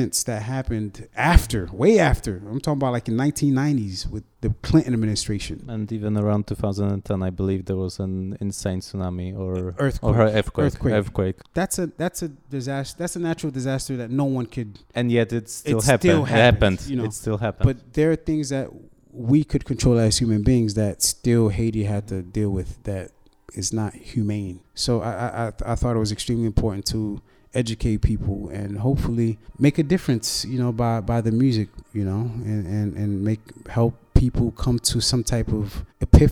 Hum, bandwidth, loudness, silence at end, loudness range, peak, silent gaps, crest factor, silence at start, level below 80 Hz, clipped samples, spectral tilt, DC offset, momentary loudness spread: none; 17.5 kHz; -23 LUFS; 0 s; 6 LU; 0 dBFS; none; 22 dB; 0 s; -32 dBFS; under 0.1%; -5.5 dB/octave; under 0.1%; 11 LU